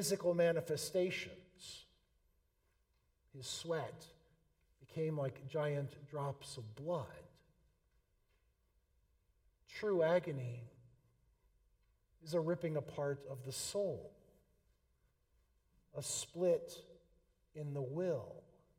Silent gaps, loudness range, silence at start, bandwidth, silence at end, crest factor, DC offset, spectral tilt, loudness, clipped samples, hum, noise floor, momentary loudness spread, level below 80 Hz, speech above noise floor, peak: none; 8 LU; 0 s; 16 kHz; 0.35 s; 20 dB; under 0.1%; -5 dB/octave; -40 LUFS; under 0.1%; none; -79 dBFS; 20 LU; -74 dBFS; 40 dB; -22 dBFS